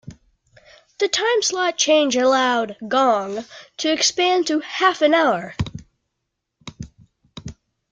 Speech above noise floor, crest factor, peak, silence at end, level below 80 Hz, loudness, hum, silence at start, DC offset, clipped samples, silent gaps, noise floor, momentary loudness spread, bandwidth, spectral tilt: 59 dB; 18 dB; -4 dBFS; 0.4 s; -52 dBFS; -19 LUFS; none; 0.05 s; under 0.1%; under 0.1%; none; -78 dBFS; 21 LU; 9.6 kHz; -2.5 dB/octave